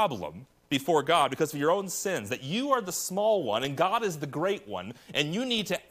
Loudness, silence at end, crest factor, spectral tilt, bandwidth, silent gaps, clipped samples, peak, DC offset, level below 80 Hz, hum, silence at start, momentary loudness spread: -28 LUFS; 0.1 s; 18 dB; -3.5 dB/octave; 15.5 kHz; none; under 0.1%; -12 dBFS; under 0.1%; -68 dBFS; none; 0 s; 8 LU